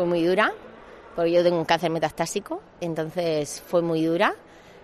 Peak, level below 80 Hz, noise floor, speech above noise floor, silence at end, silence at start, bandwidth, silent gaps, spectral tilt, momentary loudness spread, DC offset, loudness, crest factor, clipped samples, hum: -6 dBFS; -60 dBFS; -45 dBFS; 21 dB; 0.05 s; 0 s; 13.5 kHz; none; -5 dB/octave; 14 LU; under 0.1%; -24 LUFS; 18 dB; under 0.1%; none